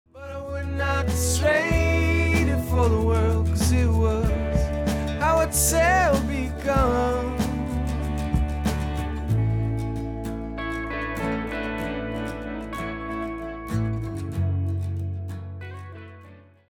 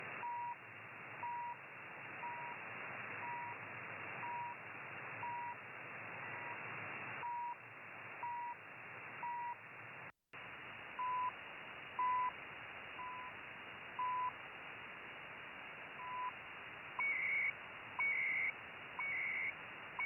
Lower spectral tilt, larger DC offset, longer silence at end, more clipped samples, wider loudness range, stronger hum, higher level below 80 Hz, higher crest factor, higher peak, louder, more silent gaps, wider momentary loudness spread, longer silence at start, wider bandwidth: about the same, -5.5 dB/octave vs -5.5 dB/octave; neither; first, 0.35 s vs 0 s; neither; about the same, 8 LU vs 8 LU; neither; first, -30 dBFS vs -82 dBFS; about the same, 16 dB vs 14 dB; first, -8 dBFS vs -30 dBFS; first, -24 LUFS vs -44 LUFS; neither; about the same, 11 LU vs 13 LU; first, 0.15 s vs 0 s; first, 17.5 kHz vs 3.2 kHz